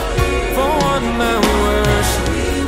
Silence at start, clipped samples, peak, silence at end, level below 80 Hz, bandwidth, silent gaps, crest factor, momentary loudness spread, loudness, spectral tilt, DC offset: 0 s; under 0.1%; -2 dBFS; 0 s; -22 dBFS; 16.5 kHz; none; 14 dB; 3 LU; -16 LUFS; -4.5 dB/octave; under 0.1%